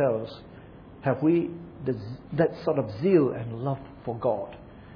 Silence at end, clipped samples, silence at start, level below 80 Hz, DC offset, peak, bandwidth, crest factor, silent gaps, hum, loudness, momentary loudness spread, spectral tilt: 0 s; under 0.1%; 0 s; -56 dBFS; under 0.1%; -8 dBFS; 5.4 kHz; 18 dB; none; none; -27 LUFS; 20 LU; -10.5 dB/octave